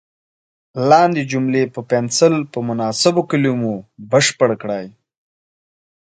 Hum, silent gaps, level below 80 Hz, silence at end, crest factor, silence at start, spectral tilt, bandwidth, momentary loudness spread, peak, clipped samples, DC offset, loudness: none; none; -62 dBFS; 1.25 s; 18 dB; 0.75 s; -4.5 dB/octave; 9.6 kHz; 12 LU; 0 dBFS; under 0.1%; under 0.1%; -17 LUFS